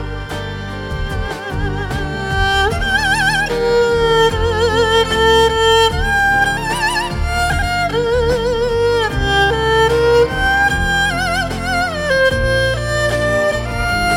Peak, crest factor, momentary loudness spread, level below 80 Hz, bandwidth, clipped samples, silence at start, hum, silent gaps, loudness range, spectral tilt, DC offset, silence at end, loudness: -2 dBFS; 14 dB; 9 LU; -26 dBFS; 16.5 kHz; under 0.1%; 0 s; none; none; 3 LU; -4 dB/octave; under 0.1%; 0 s; -15 LUFS